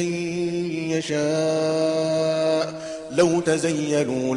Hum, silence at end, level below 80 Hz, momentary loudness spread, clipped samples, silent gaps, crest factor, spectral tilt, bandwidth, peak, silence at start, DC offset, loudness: none; 0 s; -62 dBFS; 5 LU; under 0.1%; none; 18 dB; -5 dB/octave; 11.5 kHz; -6 dBFS; 0 s; under 0.1%; -23 LUFS